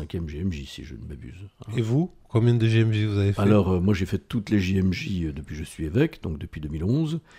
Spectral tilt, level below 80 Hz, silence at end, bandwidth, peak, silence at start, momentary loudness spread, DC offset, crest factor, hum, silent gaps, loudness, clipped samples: -7.5 dB/octave; -44 dBFS; 0.2 s; 12.5 kHz; -8 dBFS; 0 s; 18 LU; under 0.1%; 16 dB; none; none; -25 LUFS; under 0.1%